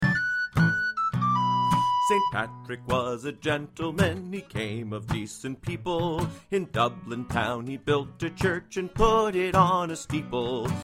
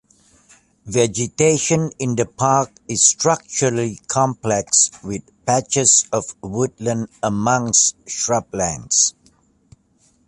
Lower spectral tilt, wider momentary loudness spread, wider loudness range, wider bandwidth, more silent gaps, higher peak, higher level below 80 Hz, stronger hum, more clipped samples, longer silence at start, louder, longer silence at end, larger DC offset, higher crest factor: first, -5.5 dB/octave vs -3.5 dB/octave; about the same, 10 LU vs 10 LU; first, 5 LU vs 2 LU; first, 16 kHz vs 11.5 kHz; neither; second, -6 dBFS vs 0 dBFS; first, -44 dBFS vs -52 dBFS; neither; neither; second, 0 s vs 0.85 s; second, -27 LUFS vs -18 LUFS; second, 0 s vs 1.15 s; neither; about the same, 20 dB vs 20 dB